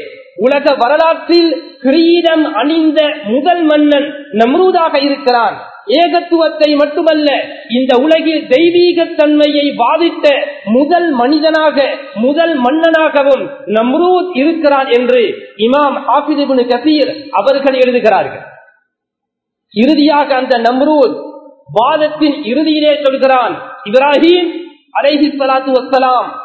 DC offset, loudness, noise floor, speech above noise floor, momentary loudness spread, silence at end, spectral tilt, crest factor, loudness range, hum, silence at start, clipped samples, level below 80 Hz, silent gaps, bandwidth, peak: under 0.1%; -11 LUFS; -77 dBFS; 67 dB; 6 LU; 0 s; -6 dB/octave; 10 dB; 2 LU; none; 0 s; 0.2%; -58 dBFS; none; 8 kHz; 0 dBFS